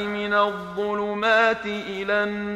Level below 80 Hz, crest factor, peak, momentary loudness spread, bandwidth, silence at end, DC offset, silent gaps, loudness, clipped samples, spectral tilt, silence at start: -58 dBFS; 16 dB; -6 dBFS; 10 LU; 11.5 kHz; 0 s; under 0.1%; none; -23 LUFS; under 0.1%; -5 dB/octave; 0 s